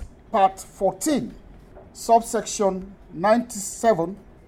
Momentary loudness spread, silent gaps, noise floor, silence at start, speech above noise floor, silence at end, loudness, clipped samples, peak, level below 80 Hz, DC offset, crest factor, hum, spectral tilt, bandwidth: 12 LU; none; -45 dBFS; 0 s; 23 dB; 0.3 s; -23 LUFS; under 0.1%; -6 dBFS; -50 dBFS; under 0.1%; 18 dB; none; -4.5 dB/octave; 16.5 kHz